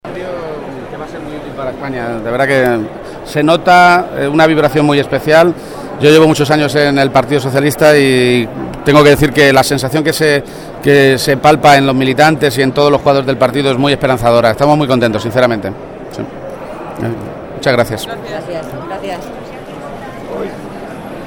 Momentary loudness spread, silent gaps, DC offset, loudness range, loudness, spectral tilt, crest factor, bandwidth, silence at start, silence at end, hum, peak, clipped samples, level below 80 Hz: 18 LU; none; under 0.1%; 10 LU; -10 LUFS; -5.5 dB/octave; 12 dB; 18.5 kHz; 0.05 s; 0 s; none; 0 dBFS; 0.4%; -38 dBFS